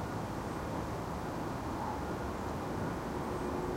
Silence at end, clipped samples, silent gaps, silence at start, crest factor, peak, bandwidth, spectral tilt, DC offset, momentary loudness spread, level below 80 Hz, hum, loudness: 0 s; under 0.1%; none; 0 s; 14 dB; -24 dBFS; 16 kHz; -6.5 dB/octave; under 0.1%; 2 LU; -50 dBFS; none; -38 LUFS